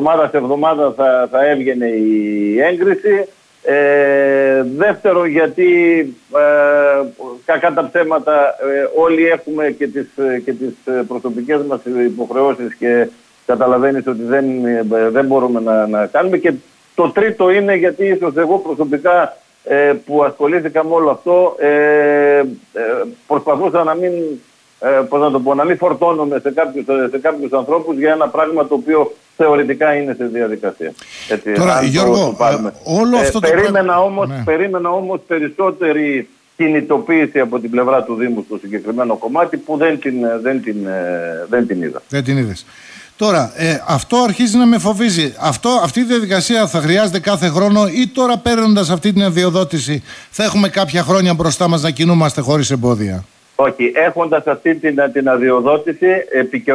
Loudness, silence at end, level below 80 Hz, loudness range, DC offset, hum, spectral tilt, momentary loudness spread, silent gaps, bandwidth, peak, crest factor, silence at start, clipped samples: -14 LUFS; 0 s; -50 dBFS; 4 LU; under 0.1%; none; -5.5 dB/octave; 8 LU; none; 11 kHz; -2 dBFS; 12 dB; 0 s; under 0.1%